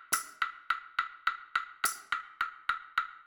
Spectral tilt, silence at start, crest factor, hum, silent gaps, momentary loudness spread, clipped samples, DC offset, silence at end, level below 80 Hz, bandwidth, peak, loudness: 2 dB/octave; 0 s; 22 dB; none; none; 5 LU; under 0.1%; under 0.1%; 0.05 s; -70 dBFS; 19.5 kHz; -14 dBFS; -34 LUFS